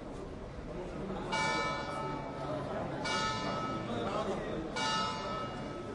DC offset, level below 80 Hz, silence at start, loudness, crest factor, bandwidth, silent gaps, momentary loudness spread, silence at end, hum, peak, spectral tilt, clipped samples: under 0.1%; -52 dBFS; 0 s; -36 LUFS; 16 dB; 11.5 kHz; none; 10 LU; 0 s; none; -20 dBFS; -4.5 dB/octave; under 0.1%